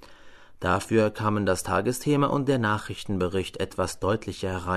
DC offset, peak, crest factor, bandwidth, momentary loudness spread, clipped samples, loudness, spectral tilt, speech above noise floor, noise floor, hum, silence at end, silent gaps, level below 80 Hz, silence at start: under 0.1%; -10 dBFS; 16 dB; 13.5 kHz; 8 LU; under 0.1%; -26 LUFS; -5.5 dB/octave; 21 dB; -47 dBFS; none; 0 s; none; -50 dBFS; 0 s